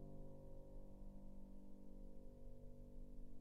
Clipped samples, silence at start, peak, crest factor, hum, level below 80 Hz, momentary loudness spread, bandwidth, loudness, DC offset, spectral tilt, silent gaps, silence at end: under 0.1%; 0 s; -44 dBFS; 10 dB; 50 Hz at -90 dBFS; -58 dBFS; 3 LU; 2 kHz; -62 LUFS; under 0.1%; -9 dB/octave; none; 0 s